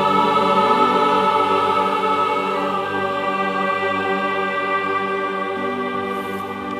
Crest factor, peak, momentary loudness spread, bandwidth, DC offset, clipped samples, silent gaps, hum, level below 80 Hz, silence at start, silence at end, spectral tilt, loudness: 16 dB; -2 dBFS; 8 LU; 15.5 kHz; under 0.1%; under 0.1%; none; none; -68 dBFS; 0 s; 0 s; -5 dB/octave; -19 LUFS